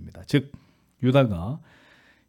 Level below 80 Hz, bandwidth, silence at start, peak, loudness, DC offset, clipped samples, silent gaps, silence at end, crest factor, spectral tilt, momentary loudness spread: -56 dBFS; 12.5 kHz; 0 s; -8 dBFS; -24 LUFS; under 0.1%; under 0.1%; none; 0.7 s; 18 dB; -8 dB/octave; 17 LU